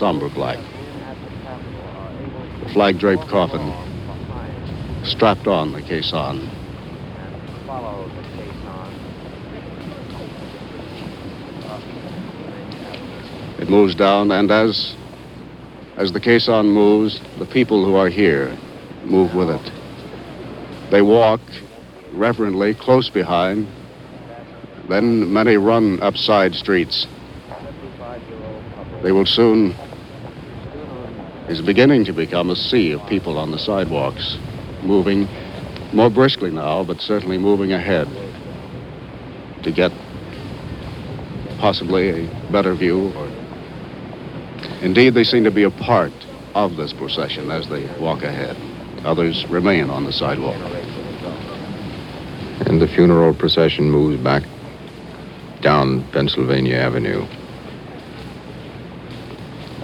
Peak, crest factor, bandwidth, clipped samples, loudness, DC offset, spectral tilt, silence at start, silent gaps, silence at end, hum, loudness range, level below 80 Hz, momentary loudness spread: 0 dBFS; 18 dB; 13 kHz; under 0.1%; -17 LUFS; under 0.1%; -7 dB/octave; 0 s; none; 0 s; none; 10 LU; -44 dBFS; 20 LU